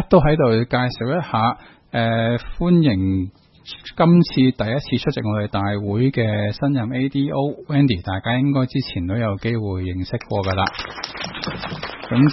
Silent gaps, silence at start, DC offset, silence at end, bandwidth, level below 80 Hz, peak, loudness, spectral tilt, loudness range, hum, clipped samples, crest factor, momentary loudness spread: none; 0 s; under 0.1%; 0 s; 6 kHz; -40 dBFS; 0 dBFS; -20 LUFS; -8.5 dB/octave; 4 LU; none; under 0.1%; 18 dB; 11 LU